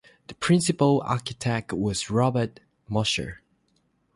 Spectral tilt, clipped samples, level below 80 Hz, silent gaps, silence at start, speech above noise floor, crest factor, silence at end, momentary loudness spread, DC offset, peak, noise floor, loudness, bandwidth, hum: -5 dB/octave; under 0.1%; -52 dBFS; none; 0.3 s; 44 dB; 18 dB; 0.8 s; 9 LU; under 0.1%; -8 dBFS; -69 dBFS; -25 LUFS; 11.5 kHz; none